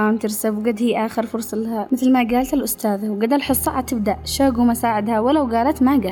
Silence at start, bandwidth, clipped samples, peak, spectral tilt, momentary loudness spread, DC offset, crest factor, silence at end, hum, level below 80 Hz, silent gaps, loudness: 0 s; 20 kHz; under 0.1%; -8 dBFS; -4.5 dB/octave; 6 LU; under 0.1%; 12 dB; 0 s; none; -44 dBFS; none; -19 LUFS